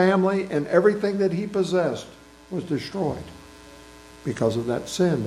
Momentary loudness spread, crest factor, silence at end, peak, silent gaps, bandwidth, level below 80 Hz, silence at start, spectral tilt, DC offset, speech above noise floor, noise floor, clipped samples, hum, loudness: 15 LU; 20 dB; 0 s; -4 dBFS; none; 13 kHz; -56 dBFS; 0 s; -6.5 dB/octave; under 0.1%; 23 dB; -46 dBFS; under 0.1%; none; -24 LUFS